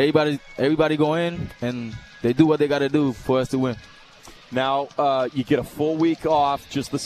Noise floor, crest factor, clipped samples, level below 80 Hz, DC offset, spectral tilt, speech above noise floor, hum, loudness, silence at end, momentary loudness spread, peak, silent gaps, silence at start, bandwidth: -46 dBFS; 20 dB; under 0.1%; -50 dBFS; under 0.1%; -6.5 dB/octave; 25 dB; none; -22 LUFS; 0 s; 9 LU; -2 dBFS; none; 0 s; 14 kHz